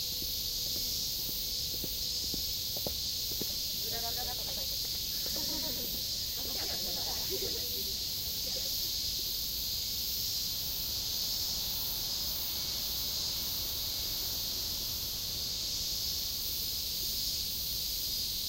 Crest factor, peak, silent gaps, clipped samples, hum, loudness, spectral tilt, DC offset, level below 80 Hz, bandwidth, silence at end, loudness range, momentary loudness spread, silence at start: 14 dB; -20 dBFS; none; under 0.1%; none; -32 LUFS; -1 dB/octave; under 0.1%; -50 dBFS; 16 kHz; 0 s; 1 LU; 1 LU; 0 s